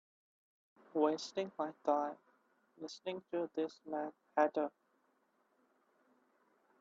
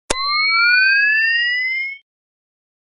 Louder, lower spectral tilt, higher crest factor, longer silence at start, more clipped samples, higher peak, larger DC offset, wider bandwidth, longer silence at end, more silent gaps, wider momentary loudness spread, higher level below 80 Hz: second, -39 LUFS vs -14 LUFS; first, -3 dB/octave vs 0.5 dB/octave; about the same, 22 dB vs 18 dB; first, 0.95 s vs 0.1 s; neither; second, -18 dBFS vs -2 dBFS; neither; second, 7.8 kHz vs 11 kHz; first, 2.1 s vs 1 s; neither; about the same, 11 LU vs 9 LU; second, under -90 dBFS vs -48 dBFS